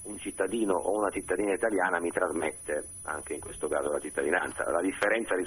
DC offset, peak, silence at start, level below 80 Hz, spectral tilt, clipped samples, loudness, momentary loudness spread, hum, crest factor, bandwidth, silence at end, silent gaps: under 0.1%; -10 dBFS; 0 s; -58 dBFS; -3.5 dB/octave; under 0.1%; -30 LUFS; 8 LU; none; 20 dB; 13 kHz; 0 s; none